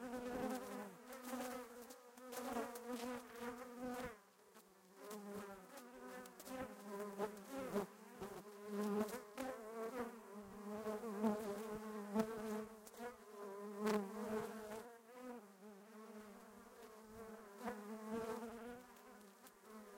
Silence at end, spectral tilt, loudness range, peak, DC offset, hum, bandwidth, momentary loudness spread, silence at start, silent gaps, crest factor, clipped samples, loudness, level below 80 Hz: 0 s; -5 dB/octave; 7 LU; -24 dBFS; under 0.1%; none; 16 kHz; 17 LU; 0 s; none; 24 dB; under 0.1%; -48 LUFS; -76 dBFS